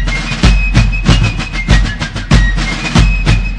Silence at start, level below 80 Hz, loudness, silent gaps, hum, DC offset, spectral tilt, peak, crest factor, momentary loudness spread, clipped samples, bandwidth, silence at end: 0 s; -12 dBFS; -12 LUFS; none; none; under 0.1%; -5 dB/octave; 0 dBFS; 10 dB; 5 LU; 2%; 10 kHz; 0 s